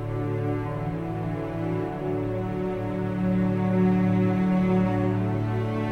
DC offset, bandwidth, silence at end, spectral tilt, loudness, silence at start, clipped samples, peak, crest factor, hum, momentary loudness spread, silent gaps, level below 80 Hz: under 0.1%; 4.9 kHz; 0 s; -9.5 dB/octave; -26 LUFS; 0 s; under 0.1%; -12 dBFS; 14 dB; none; 8 LU; none; -46 dBFS